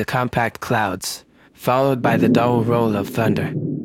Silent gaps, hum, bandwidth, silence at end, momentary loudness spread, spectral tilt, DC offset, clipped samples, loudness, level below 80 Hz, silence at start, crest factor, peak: none; none; 17 kHz; 0 s; 10 LU; -6 dB/octave; under 0.1%; under 0.1%; -19 LUFS; -50 dBFS; 0 s; 18 dB; -2 dBFS